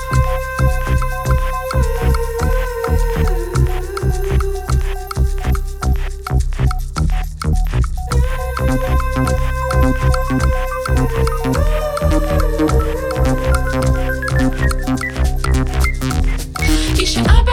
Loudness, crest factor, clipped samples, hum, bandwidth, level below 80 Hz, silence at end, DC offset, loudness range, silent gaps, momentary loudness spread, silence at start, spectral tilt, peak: -18 LUFS; 14 dB; under 0.1%; none; 16 kHz; -18 dBFS; 0 s; under 0.1%; 3 LU; none; 4 LU; 0 s; -6 dB/octave; 0 dBFS